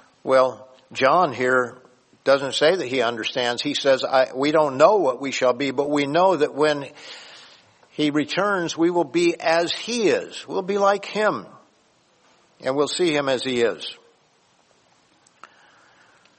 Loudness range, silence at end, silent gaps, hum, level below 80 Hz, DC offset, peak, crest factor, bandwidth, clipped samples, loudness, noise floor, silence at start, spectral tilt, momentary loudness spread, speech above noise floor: 6 LU; 2.45 s; none; none; -70 dBFS; under 0.1%; -2 dBFS; 20 dB; 8.8 kHz; under 0.1%; -21 LUFS; -61 dBFS; 0.25 s; -4 dB/octave; 10 LU; 40 dB